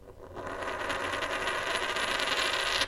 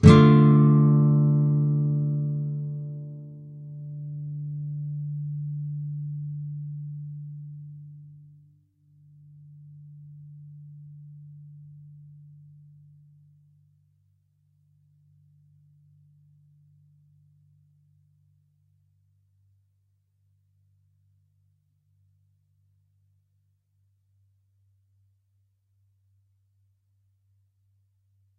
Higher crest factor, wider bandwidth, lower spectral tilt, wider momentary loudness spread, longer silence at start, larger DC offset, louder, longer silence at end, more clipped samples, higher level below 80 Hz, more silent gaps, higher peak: about the same, 24 dB vs 28 dB; first, 16.5 kHz vs 3.1 kHz; second, -1.5 dB/octave vs -9 dB/octave; second, 11 LU vs 30 LU; about the same, 0 s vs 0 s; neither; second, -30 LUFS vs -23 LUFS; second, 0 s vs 16.9 s; neither; about the same, -54 dBFS vs -52 dBFS; neither; second, -8 dBFS vs 0 dBFS